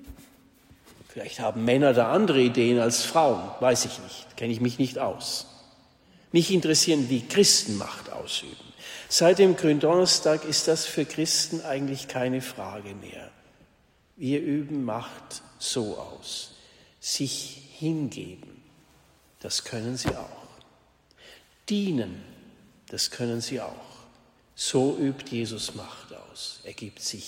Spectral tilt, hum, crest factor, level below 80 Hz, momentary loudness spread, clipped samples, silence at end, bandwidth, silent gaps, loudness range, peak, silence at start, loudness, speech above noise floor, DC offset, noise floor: -3.5 dB/octave; none; 22 dB; -60 dBFS; 20 LU; under 0.1%; 0 s; 16 kHz; none; 11 LU; -6 dBFS; 0 s; -25 LUFS; 37 dB; under 0.1%; -63 dBFS